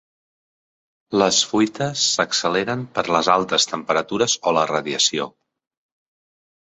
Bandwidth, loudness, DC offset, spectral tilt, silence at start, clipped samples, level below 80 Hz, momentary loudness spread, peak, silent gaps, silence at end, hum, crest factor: 8.4 kHz; -19 LUFS; under 0.1%; -2.5 dB/octave; 1.1 s; under 0.1%; -60 dBFS; 6 LU; -2 dBFS; none; 1.35 s; none; 20 dB